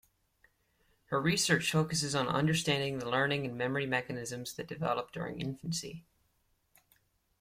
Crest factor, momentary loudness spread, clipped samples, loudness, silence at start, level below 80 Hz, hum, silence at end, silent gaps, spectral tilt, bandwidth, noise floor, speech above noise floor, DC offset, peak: 20 dB; 11 LU; under 0.1%; -32 LUFS; 1.1 s; -66 dBFS; none; 1.4 s; none; -4 dB/octave; 16 kHz; -75 dBFS; 42 dB; under 0.1%; -14 dBFS